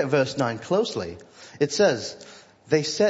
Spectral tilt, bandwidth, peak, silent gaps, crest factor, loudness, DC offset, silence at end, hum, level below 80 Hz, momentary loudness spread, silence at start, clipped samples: -4.5 dB/octave; 8 kHz; -8 dBFS; none; 18 dB; -24 LUFS; under 0.1%; 0 s; none; -64 dBFS; 22 LU; 0 s; under 0.1%